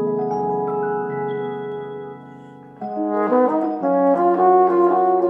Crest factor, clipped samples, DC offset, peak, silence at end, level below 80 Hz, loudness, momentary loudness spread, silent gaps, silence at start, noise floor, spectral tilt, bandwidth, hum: 14 dB; under 0.1%; under 0.1%; -4 dBFS; 0 s; -70 dBFS; -19 LUFS; 17 LU; none; 0 s; -40 dBFS; -9.5 dB/octave; 5.6 kHz; none